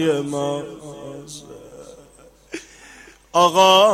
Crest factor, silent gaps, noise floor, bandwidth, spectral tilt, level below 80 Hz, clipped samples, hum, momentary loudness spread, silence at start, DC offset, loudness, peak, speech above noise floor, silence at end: 18 dB; none; -49 dBFS; 16 kHz; -3.5 dB/octave; -58 dBFS; under 0.1%; none; 27 LU; 0 s; under 0.1%; -17 LUFS; -2 dBFS; 31 dB; 0 s